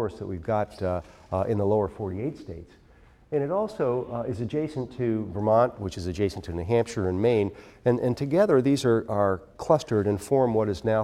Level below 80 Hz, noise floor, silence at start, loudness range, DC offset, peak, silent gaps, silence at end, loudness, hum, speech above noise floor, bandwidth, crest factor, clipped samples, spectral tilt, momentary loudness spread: -52 dBFS; -55 dBFS; 0 s; 6 LU; under 0.1%; -6 dBFS; none; 0 s; -26 LUFS; none; 30 dB; 14 kHz; 20 dB; under 0.1%; -7.5 dB/octave; 10 LU